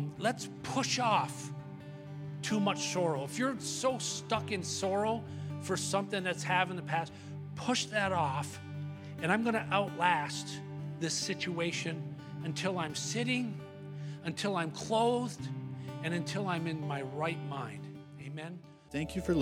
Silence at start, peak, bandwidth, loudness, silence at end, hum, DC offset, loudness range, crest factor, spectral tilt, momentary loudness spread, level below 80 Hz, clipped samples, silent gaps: 0 s; -14 dBFS; 16 kHz; -34 LUFS; 0 s; none; under 0.1%; 3 LU; 22 dB; -4.5 dB/octave; 13 LU; -64 dBFS; under 0.1%; none